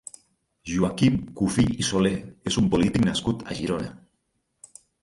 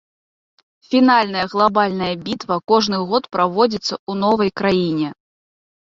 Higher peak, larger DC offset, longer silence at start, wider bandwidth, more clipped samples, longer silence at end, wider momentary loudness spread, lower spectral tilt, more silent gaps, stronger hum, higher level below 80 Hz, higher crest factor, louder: second, -8 dBFS vs -2 dBFS; neither; second, 0.65 s vs 0.9 s; first, 11.5 kHz vs 7.6 kHz; neither; first, 1.1 s vs 0.8 s; about the same, 10 LU vs 9 LU; about the same, -5.5 dB/octave vs -5.5 dB/octave; second, none vs 3.99-4.07 s; neither; first, -46 dBFS vs -56 dBFS; about the same, 18 dB vs 18 dB; second, -24 LUFS vs -18 LUFS